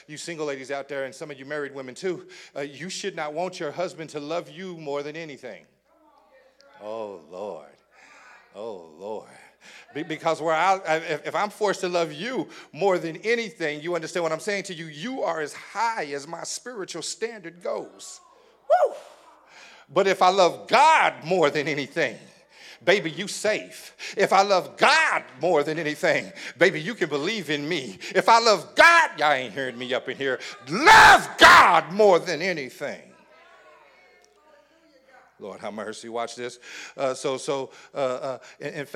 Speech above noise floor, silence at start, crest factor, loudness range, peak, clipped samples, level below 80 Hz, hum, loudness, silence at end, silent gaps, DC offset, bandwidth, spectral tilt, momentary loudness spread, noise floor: 36 dB; 0.1 s; 22 dB; 21 LU; -2 dBFS; under 0.1%; -58 dBFS; none; -22 LUFS; 0.1 s; none; under 0.1%; 17.5 kHz; -3 dB/octave; 19 LU; -59 dBFS